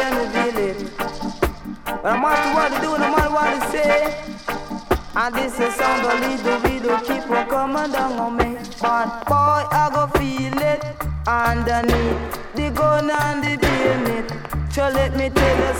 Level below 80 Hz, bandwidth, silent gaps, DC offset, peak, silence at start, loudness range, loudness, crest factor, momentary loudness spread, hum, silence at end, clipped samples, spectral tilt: -32 dBFS; 19.5 kHz; none; under 0.1%; -2 dBFS; 0 s; 1 LU; -20 LUFS; 18 dB; 9 LU; none; 0 s; under 0.1%; -5.5 dB/octave